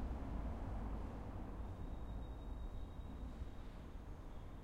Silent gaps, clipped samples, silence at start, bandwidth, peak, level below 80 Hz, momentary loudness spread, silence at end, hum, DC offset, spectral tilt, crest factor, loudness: none; under 0.1%; 0 s; 9.4 kHz; -32 dBFS; -48 dBFS; 8 LU; 0 s; none; under 0.1%; -8 dB/octave; 14 dB; -50 LUFS